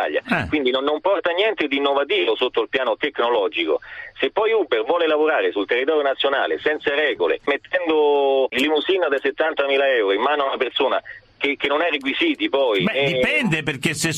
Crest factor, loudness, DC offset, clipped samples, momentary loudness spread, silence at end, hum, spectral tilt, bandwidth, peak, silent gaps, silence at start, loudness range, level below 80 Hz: 16 dB; -20 LUFS; under 0.1%; under 0.1%; 4 LU; 0 s; none; -4 dB/octave; 14.5 kHz; -4 dBFS; none; 0 s; 1 LU; -56 dBFS